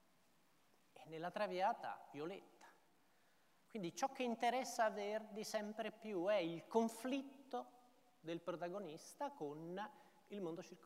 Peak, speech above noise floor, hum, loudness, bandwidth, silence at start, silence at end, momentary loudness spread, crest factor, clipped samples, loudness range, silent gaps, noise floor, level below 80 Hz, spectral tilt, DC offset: -24 dBFS; 33 dB; none; -45 LUFS; 16 kHz; 0.95 s; 0 s; 12 LU; 22 dB; under 0.1%; 7 LU; none; -77 dBFS; under -90 dBFS; -4.5 dB/octave; under 0.1%